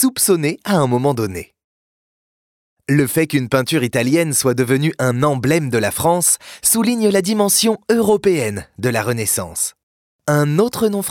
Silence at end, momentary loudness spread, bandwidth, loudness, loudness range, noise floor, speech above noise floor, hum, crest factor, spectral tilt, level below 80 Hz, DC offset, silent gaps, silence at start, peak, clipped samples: 0 s; 7 LU; 18 kHz; -16 LUFS; 4 LU; under -90 dBFS; over 74 dB; none; 14 dB; -4.5 dB/octave; -52 dBFS; under 0.1%; 1.64-2.77 s, 9.83-10.19 s; 0 s; -4 dBFS; under 0.1%